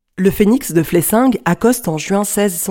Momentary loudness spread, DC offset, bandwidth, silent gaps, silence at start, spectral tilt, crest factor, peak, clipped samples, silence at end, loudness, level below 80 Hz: 5 LU; under 0.1%; 17 kHz; none; 0.2 s; -5 dB/octave; 14 dB; 0 dBFS; under 0.1%; 0 s; -15 LUFS; -40 dBFS